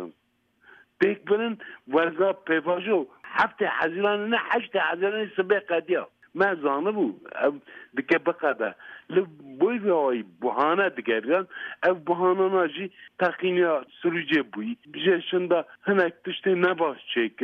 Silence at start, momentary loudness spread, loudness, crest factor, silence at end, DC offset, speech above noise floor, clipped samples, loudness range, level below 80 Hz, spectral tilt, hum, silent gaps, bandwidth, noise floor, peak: 0 s; 7 LU; -25 LUFS; 16 dB; 0 s; under 0.1%; 44 dB; under 0.1%; 2 LU; -74 dBFS; -7.5 dB/octave; none; none; 5.4 kHz; -70 dBFS; -10 dBFS